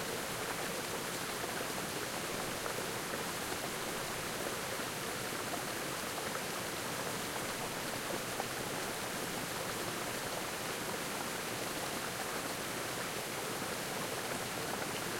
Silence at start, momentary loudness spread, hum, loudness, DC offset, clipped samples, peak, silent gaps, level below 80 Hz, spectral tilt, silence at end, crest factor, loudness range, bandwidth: 0 s; 0 LU; none; -38 LUFS; under 0.1%; under 0.1%; -22 dBFS; none; -64 dBFS; -2.5 dB/octave; 0 s; 18 dB; 0 LU; 16.5 kHz